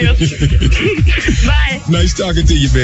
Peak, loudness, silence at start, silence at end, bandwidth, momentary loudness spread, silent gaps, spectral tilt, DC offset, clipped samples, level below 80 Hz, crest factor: 0 dBFS; -13 LUFS; 0 s; 0 s; 8.2 kHz; 2 LU; none; -5 dB/octave; under 0.1%; under 0.1%; -14 dBFS; 10 dB